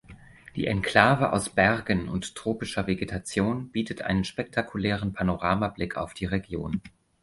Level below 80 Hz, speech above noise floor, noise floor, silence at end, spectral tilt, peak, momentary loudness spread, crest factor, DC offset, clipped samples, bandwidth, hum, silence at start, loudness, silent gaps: -46 dBFS; 22 dB; -49 dBFS; 0.35 s; -5.5 dB/octave; -2 dBFS; 11 LU; 24 dB; under 0.1%; under 0.1%; 11.5 kHz; none; 0.1 s; -27 LUFS; none